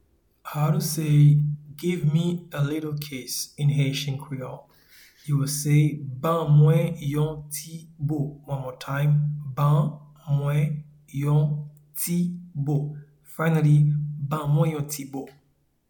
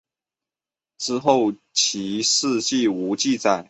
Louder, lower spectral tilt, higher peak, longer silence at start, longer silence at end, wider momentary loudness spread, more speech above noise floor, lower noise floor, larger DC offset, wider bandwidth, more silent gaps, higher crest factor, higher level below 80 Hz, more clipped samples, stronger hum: second, -24 LUFS vs -21 LUFS; first, -6.5 dB/octave vs -2.5 dB/octave; second, -8 dBFS vs -2 dBFS; second, 0.45 s vs 1 s; first, 0.6 s vs 0.05 s; first, 16 LU vs 4 LU; second, 31 dB vs over 69 dB; second, -54 dBFS vs under -90 dBFS; neither; first, 19 kHz vs 8.2 kHz; neither; about the same, 16 dB vs 20 dB; first, -58 dBFS vs -66 dBFS; neither; neither